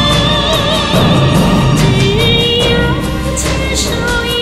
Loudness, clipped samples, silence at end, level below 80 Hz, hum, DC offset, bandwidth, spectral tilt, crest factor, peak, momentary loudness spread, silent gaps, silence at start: -11 LUFS; under 0.1%; 0 s; -22 dBFS; none; under 0.1%; 15.5 kHz; -4.5 dB/octave; 12 dB; 0 dBFS; 5 LU; none; 0 s